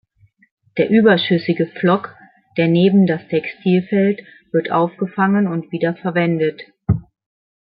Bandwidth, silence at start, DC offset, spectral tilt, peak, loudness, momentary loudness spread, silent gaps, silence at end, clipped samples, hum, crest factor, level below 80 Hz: 5.2 kHz; 0.75 s; under 0.1%; -12 dB/octave; -2 dBFS; -17 LUFS; 9 LU; none; 0.6 s; under 0.1%; none; 16 dB; -48 dBFS